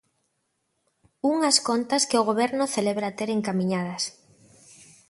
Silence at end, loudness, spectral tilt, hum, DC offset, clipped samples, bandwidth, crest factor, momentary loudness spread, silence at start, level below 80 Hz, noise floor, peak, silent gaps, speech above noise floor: 1 s; -24 LUFS; -3.5 dB/octave; none; under 0.1%; under 0.1%; 11.5 kHz; 22 dB; 8 LU; 1.25 s; -70 dBFS; -75 dBFS; -4 dBFS; none; 51 dB